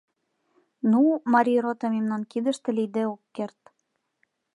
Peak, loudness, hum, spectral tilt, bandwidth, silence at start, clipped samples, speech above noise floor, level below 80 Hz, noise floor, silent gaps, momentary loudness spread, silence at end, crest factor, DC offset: -8 dBFS; -25 LUFS; none; -6.5 dB/octave; 11 kHz; 0.85 s; under 0.1%; 53 dB; -82 dBFS; -77 dBFS; none; 14 LU; 1.1 s; 18 dB; under 0.1%